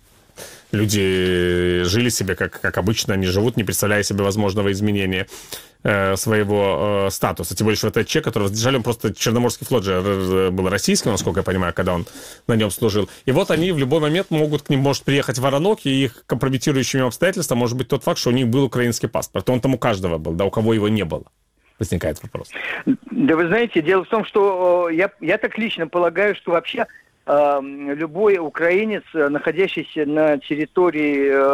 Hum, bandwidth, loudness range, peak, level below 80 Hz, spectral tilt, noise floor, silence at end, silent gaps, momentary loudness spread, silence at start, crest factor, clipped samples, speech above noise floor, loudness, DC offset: none; 16.5 kHz; 2 LU; -2 dBFS; -46 dBFS; -5 dB/octave; -41 dBFS; 0 s; none; 6 LU; 0.4 s; 18 dB; under 0.1%; 22 dB; -19 LUFS; under 0.1%